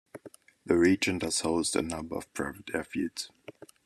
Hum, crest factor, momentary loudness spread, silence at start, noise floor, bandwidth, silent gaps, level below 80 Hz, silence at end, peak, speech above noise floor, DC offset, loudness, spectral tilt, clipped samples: none; 20 dB; 23 LU; 0.15 s; -53 dBFS; 13.5 kHz; none; -60 dBFS; 0.35 s; -10 dBFS; 23 dB; under 0.1%; -30 LUFS; -4 dB/octave; under 0.1%